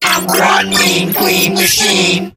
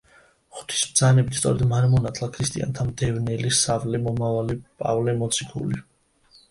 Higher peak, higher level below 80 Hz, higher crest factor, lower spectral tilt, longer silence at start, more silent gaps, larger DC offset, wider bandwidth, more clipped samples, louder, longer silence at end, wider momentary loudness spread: first, 0 dBFS vs -6 dBFS; about the same, -48 dBFS vs -46 dBFS; second, 12 dB vs 18 dB; second, -2.5 dB/octave vs -4.5 dB/octave; second, 0 s vs 0.55 s; neither; neither; first, 17.5 kHz vs 11.5 kHz; neither; first, -10 LUFS vs -23 LUFS; second, 0.05 s vs 0.7 s; second, 2 LU vs 10 LU